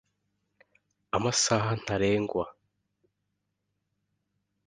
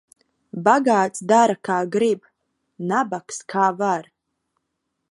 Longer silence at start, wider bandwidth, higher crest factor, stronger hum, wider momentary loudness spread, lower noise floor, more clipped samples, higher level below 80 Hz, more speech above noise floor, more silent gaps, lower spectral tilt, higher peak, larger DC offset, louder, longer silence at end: first, 1.15 s vs 0.55 s; about the same, 11 kHz vs 11.5 kHz; about the same, 22 dB vs 20 dB; first, 50 Hz at -55 dBFS vs none; about the same, 9 LU vs 11 LU; first, -81 dBFS vs -77 dBFS; neither; first, -58 dBFS vs -76 dBFS; about the same, 54 dB vs 57 dB; neither; about the same, -4 dB/octave vs -5 dB/octave; second, -10 dBFS vs -2 dBFS; neither; second, -28 LUFS vs -20 LUFS; first, 2.15 s vs 1.1 s